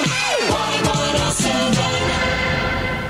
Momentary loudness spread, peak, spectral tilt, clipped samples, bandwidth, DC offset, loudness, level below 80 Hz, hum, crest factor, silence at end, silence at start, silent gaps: 2 LU; -4 dBFS; -3.5 dB/octave; under 0.1%; 16 kHz; under 0.1%; -18 LUFS; -34 dBFS; none; 14 dB; 0 s; 0 s; none